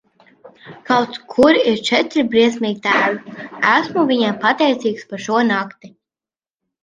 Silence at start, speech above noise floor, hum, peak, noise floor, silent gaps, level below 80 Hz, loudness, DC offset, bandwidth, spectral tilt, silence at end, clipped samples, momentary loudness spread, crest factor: 0.45 s; over 73 dB; none; 0 dBFS; under -90 dBFS; none; -60 dBFS; -16 LUFS; under 0.1%; 9.8 kHz; -4.5 dB/octave; 0.95 s; under 0.1%; 8 LU; 16 dB